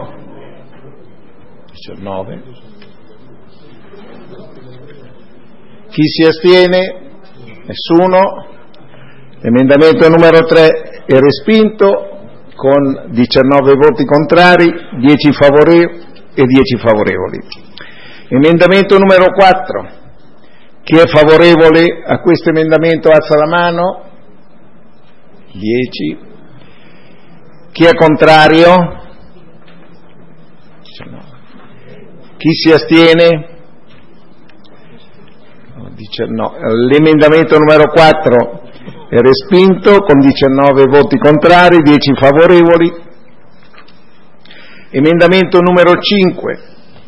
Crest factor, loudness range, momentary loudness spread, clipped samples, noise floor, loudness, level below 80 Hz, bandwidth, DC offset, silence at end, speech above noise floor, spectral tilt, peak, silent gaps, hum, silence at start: 10 dB; 9 LU; 16 LU; 1%; -44 dBFS; -8 LUFS; -40 dBFS; 11 kHz; 3%; 0.5 s; 37 dB; -7 dB/octave; 0 dBFS; none; none; 0 s